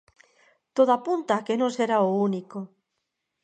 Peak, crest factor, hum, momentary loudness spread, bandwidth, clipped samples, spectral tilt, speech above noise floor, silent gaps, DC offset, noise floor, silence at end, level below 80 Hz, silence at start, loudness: -8 dBFS; 18 dB; none; 16 LU; 9.2 kHz; under 0.1%; -6 dB/octave; 57 dB; none; under 0.1%; -80 dBFS; 0.75 s; -80 dBFS; 0.75 s; -24 LUFS